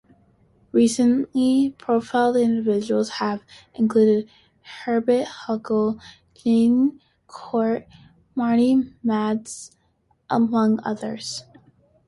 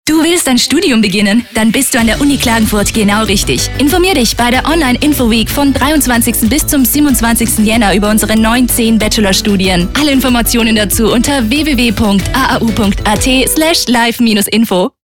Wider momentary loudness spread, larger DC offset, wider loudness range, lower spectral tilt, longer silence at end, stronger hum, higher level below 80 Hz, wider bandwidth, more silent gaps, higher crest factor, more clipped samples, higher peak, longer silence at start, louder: first, 15 LU vs 2 LU; neither; about the same, 3 LU vs 1 LU; first, -5.5 dB/octave vs -3.5 dB/octave; first, 0.65 s vs 0.15 s; neither; second, -62 dBFS vs -24 dBFS; second, 11.5 kHz vs 18 kHz; neither; first, 16 dB vs 8 dB; neither; second, -6 dBFS vs -2 dBFS; first, 0.75 s vs 0.05 s; second, -21 LUFS vs -9 LUFS